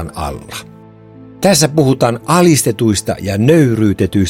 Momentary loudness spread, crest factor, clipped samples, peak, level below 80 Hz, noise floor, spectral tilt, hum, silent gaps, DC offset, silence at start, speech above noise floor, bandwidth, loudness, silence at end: 13 LU; 14 dB; under 0.1%; 0 dBFS; -40 dBFS; -37 dBFS; -5 dB/octave; none; none; under 0.1%; 0 s; 25 dB; 17 kHz; -12 LUFS; 0 s